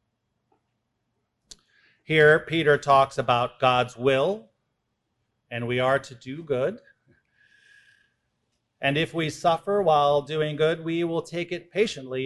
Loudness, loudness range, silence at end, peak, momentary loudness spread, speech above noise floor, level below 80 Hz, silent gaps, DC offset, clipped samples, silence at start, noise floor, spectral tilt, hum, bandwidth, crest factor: -23 LUFS; 8 LU; 0 s; -6 dBFS; 11 LU; 54 dB; -60 dBFS; none; under 0.1%; under 0.1%; 2.1 s; -77 dBFS; -5.5 dB/octave; none; 12 kHz; 20 dB